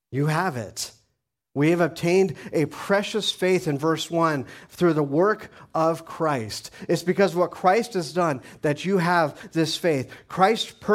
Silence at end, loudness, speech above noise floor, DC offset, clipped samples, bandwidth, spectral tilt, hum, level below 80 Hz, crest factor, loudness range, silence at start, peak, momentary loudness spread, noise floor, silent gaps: 0 s; -24 LUFS; 54 dB; under 0.1%; under 0.1%; 16 kHz; -5.5 dB/octave; none; -62 dBFS; 20 dB; 1 LU; 0.1 s; -4 dBFS; 10 LU; -77 dBFS; none